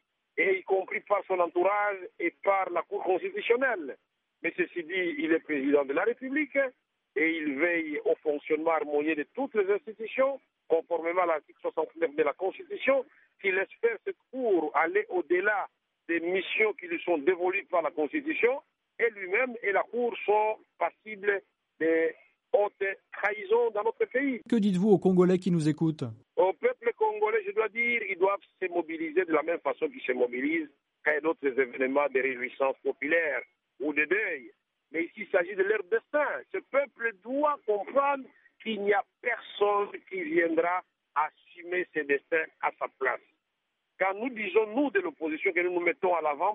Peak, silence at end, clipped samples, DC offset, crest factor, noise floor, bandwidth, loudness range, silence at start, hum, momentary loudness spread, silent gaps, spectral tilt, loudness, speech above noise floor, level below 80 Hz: -10 dBFS; 0 s; under 0.1%; under 0.1%; 18 dB; -81 dBFS; 6.6 kHz; 3 LU; 0.35 s; none; 7 LU; none; -4.5 dB/octave; -29 LUFS; 53 dB; -82 dBFS